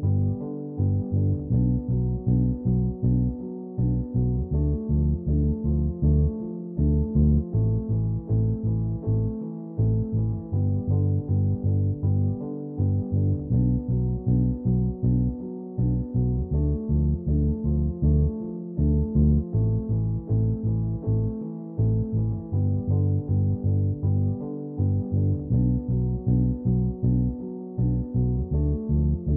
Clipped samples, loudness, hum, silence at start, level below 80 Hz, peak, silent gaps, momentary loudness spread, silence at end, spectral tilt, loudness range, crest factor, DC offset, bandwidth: under 0.1%; -25 LUFS; none; 0 s; -32 dBFS; -10 dBFS; none; 5 LU; 0 s; -16 dB/octave; 1 LU; 14 dB; under 0.1%; 1.3 kHz